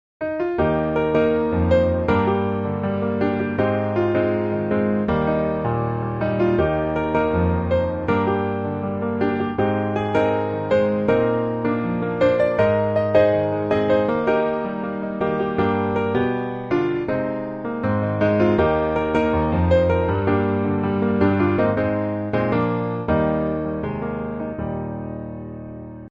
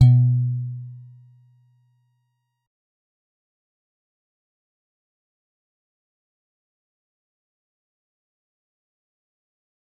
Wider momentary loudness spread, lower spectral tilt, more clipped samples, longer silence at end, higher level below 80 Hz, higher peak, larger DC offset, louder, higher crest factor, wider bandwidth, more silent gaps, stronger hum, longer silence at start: second, 8 LU vs 25 LU; about the same, -9.5 dB/octave vs -10 dB/octave; neither; second, 0 s vs 9 s; first, -40 dBFS vs -58 dBFS; about the same, -4 dBFS vs -2 dBFS; neither; about the same, -21 LUFS vs -20 LUFS; second, 18 dB vs 24 dB; first, 7.4 kHz vs 4.3 kHz; neither; neither; first, 0.2 s vs 0 s